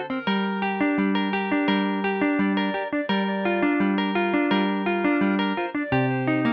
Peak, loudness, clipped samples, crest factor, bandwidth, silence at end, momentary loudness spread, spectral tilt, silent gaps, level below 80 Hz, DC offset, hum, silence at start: -10 dBFS; -23 LUFS; under 0.1%; 14 dB; 5.4 kHz; 0 s; 3 LU; -9 dB/octave; none; -60 dBFS; under 0.1%; none; 0 s